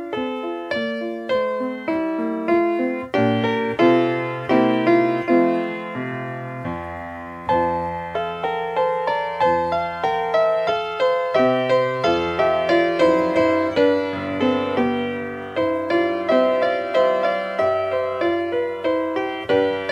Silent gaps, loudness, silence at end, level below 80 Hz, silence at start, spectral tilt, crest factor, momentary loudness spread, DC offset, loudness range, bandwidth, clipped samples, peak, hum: none; -21 LUFS; 0 s; -54 dBFS; 0 s; -6.5 dB/octave; 16 dB; 9 LU; under 0.1%; 4 LU; 8.6 kHz; under 0.1%; -4 dBFS; none